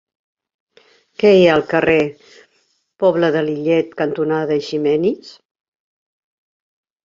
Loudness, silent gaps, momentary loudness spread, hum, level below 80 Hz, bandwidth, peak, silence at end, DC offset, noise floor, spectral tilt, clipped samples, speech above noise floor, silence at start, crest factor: -16 LUFS; none; 10 LU; none; -56 dBFS; 7.6 kHz; -2 dBFS; 1.75 s; under 0.1%; -63 dBFS; -7 dB/octave; under 0.1%; 48 dB; 1.2 s; 18 dB